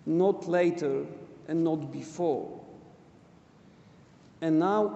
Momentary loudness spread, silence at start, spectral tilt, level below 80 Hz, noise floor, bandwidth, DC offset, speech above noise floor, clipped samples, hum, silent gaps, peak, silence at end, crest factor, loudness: 17 LU; 0.05 s; -7.5 dB/octave; -72 dBFS; -56 dBFS; 8.2 kHz; under 0.1%; 29 dB; under 0.1%; none; none; -12 dBFS; 0 s; 16 dB; -29 LUFS